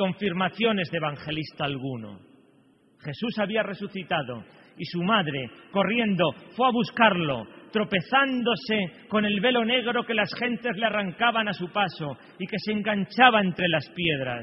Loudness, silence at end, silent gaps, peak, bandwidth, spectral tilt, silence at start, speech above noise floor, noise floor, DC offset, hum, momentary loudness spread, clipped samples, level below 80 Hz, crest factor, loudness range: -25 LUFS; 0 s; none; -2 dBFS; 6 kHz; -8 dB/octave; 0 s; 35 dB; -60 dBFS; under 0.1%; none; 13 LU; under 0.1%; -64 dBFS; 24 dB; 7 LU